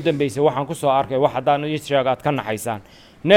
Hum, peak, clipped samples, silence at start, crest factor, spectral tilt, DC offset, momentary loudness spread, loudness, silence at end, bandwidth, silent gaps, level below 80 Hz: none; 0 dBFS; under 0.1%; 0 s; 20 dB; -5.5 dB/octave; under 0.1%; 8 LU; -21 LUFS; 0 s; 17 kHz; none; -56 dBFS